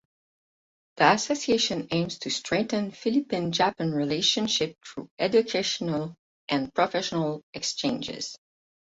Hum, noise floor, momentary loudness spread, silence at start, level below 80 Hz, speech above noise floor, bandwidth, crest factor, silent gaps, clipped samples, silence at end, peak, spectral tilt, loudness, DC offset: none; under -90 dBFS; 9 LU; 0.95 s; -64 dBFS; over 64 dB; 8 kHz; 24 dB; 5.11-5.17 s, 6.19-6.48 s, 7.43-7.53 s; under 0.1%; 0.55 s; -4 dBFS; -4 dB/octave; -26 LUFS; under 0.1%